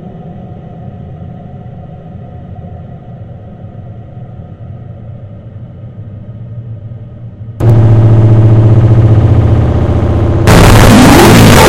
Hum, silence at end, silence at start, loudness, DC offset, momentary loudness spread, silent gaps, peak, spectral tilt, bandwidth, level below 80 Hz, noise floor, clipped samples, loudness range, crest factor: none; 0 s; 0.05 s; -5 LUFS; under 0.1%; 25 LU; none; 0 dBFS; -6 dB/octave; 16.5 kHz; -20 dBFS; -27 dBFS; 0.5%; 22 LU; 8 dB